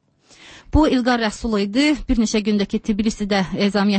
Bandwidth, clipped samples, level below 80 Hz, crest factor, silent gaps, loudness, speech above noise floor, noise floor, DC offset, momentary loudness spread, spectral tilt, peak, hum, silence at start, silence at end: 8.8 kHz; under 0.1%; -32 dBFS; 14 dB; none; -19 LUFS; 30 dB; -48 dBFS; under 0.1%; 5 LU; -5 dB/octave; -4 dBFS; none; 0.45 s; 0 s